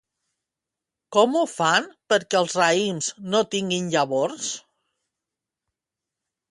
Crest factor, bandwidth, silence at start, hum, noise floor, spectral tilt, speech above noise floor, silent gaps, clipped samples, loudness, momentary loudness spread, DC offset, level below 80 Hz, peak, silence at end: 20 dB; 11.5 kHz; 1.1 s; none; -87 dBFS; -3 dB/octave; 65 dB; none; under 0.1%; -22 LUFS; 7 LU; under 0.1%; -72 dBFS; -6 dBFS; 1.9 s